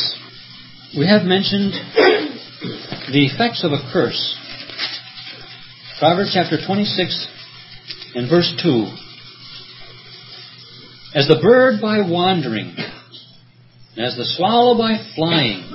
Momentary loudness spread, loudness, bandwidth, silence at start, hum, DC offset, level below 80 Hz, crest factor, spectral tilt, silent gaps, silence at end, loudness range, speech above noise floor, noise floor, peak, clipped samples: 23 LU; -17 LUFS; 5.8 kHz; 0 s; none; under 0.1%; -58 dBFS; 18 dB; -8.5 dB/octave; none; 0 s; 4 LU; 31 dB; -47 dBFS; 0 dBFS; under 0.1%